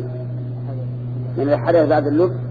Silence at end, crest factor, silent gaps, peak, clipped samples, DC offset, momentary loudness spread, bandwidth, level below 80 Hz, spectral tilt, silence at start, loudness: 0 s; 16 dB; none; -4 dBFS; under 0.1%; under 0.1%; 12 LU; 4.9 kHz; -48 dBFS; -10.5 dB/octave; 0 s; -20 LUFS